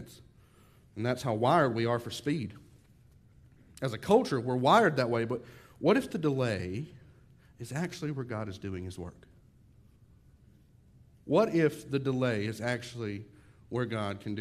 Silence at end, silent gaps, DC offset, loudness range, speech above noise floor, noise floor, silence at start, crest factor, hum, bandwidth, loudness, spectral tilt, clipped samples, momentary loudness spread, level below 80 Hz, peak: 0 s; none; under 0.1%; 12 LU; 30 dB; -60 dBFS; 0 s; 22 dB; none; 14.5 kHz; -30 LUFS; -6.5 dB/octave; under 0.1%; 15 LU; -64 dBFS; -10 dBFS